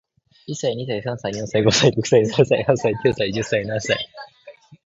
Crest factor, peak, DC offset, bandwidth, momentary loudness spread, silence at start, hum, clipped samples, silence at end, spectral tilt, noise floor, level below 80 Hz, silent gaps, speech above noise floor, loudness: 18 dB; -2 dBFS; under 0.1%; 8 kHz; 11 LU; 0.5 s; none; under 0.1%; 0.1 s; -4.5 dB/octave; -46 dBFS; -52 dBFS; none; 26 dB; -20 LUFS